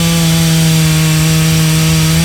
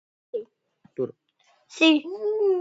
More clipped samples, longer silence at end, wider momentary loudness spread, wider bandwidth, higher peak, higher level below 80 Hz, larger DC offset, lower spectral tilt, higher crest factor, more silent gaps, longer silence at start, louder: neither; about the same, 0 s vs 0 s; second, 1 LU vs 18 LU; first, 19 kHz vs 8 kHz; first, 0 dBFS vs -6 dBFS; first, -28 dBFS vs -84 dBFS; neither; about the same, -4.5 dB/octave vs -4 dB/octave; second, 10 dB vs 20 dB; neither; second, 0 s vs 0.35 s; first, -10 LUFS vs -24 LUFS